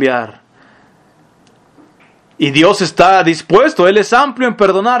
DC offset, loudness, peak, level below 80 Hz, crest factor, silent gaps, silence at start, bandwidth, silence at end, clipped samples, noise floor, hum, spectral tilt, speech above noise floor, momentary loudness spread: under 0.1%; -11 LUFS; 0 dBFS; -50 dBFS; 12 dB; none; 0 s; 12 kHz; 0 s; 0.4%; -49 dBFS; none; -4.5 dB/octave; 39 dB; 7 LU